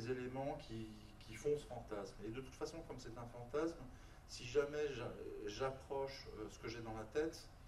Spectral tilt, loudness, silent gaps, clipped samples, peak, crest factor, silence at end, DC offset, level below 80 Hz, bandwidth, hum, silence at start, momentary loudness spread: -5.5 dB/octave; -46 LUFS; none; under 0.1%; -24 dBFS; 20 dB; 0 s; under 0.1%; -60 dBFS; 13 kHz; none; 0 s; 11 LU